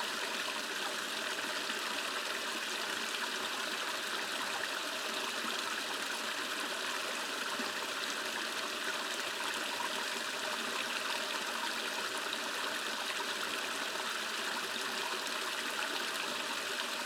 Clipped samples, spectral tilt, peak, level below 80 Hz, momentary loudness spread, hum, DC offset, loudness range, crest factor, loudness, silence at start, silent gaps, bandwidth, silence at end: under 0.1%; 0 dB/octave; -18 dBFS; under -90 dBFS; 1 LU; none; under 0.1%; 0 LU; 18 dB; -35 LUFS; 0 s; none; 19.5 kHz; 0 s